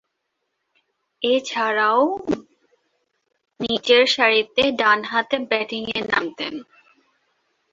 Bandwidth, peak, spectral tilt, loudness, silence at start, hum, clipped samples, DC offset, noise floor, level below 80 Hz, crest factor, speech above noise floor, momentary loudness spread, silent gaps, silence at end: 7.8 kHz; -2 dBFS; -3 dB/octave; -20 LUFS; 1.2 s; none; under 0.1%; under 0.1%; -76 dBFS; -62 dBFS; 20 dB; 56 dB; 13 LU; none; 1.1 s